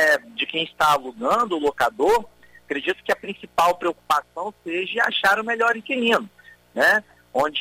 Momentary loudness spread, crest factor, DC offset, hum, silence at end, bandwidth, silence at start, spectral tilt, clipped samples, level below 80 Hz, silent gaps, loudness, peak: 9 LU; 14 dB; under 0.1%; none; 0 s; 16 kHz; 0 s; -3 dB/octave; under 0.1%; -56 dBFS; none; -22 LUFS; -8 dBFS